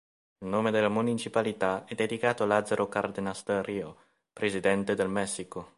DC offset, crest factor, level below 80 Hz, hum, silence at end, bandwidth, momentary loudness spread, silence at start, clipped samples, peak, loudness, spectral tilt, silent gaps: under 0.1%; 22 dB; -64 dBFS; none; 0.1 s; 11.5 kHz; 8 LU; 0.4 s; under 0.1%; -8 dBFS; -29 LUFS; -5 dB/octave; none